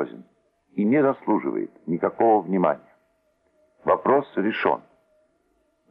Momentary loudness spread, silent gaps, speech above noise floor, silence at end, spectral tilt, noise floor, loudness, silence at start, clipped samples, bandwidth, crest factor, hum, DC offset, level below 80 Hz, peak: 11 LU; none; 46 dB; 1.15 s; -10 dB/octave; -68 dBFS; -23 LUFS; 0 s; under 0.1%; 5.4 kHz; 20 dB; none; under 0.1%; -70 dBFS; -6 dBFS